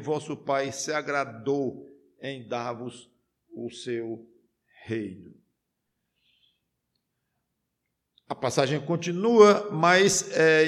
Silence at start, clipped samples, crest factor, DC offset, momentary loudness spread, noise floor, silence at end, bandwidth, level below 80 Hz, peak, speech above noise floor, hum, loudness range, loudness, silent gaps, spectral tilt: 0 s; under 0.1%; 22 dB; under 0.1%; 20 LU; -81 dBFS; 0 s; 13.5 kHz; -70 dBFS; -4 dBFS; 56 dB; none; 19 LU; -25 LUFS; none; -4 dB/octave